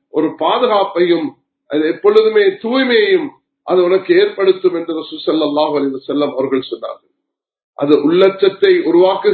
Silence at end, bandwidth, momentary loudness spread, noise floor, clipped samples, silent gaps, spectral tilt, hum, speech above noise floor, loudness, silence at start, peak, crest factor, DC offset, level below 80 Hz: 0 s; 4.5 kHz; 10 LU; -76 dBFS; under 0.1%; 7.64-7.73 s; -8 dB/octave; none; 63 dB; -14 LUFS; 0.15 s; 0 dBFS; 14 dB; under 0.1%; -66 dBFS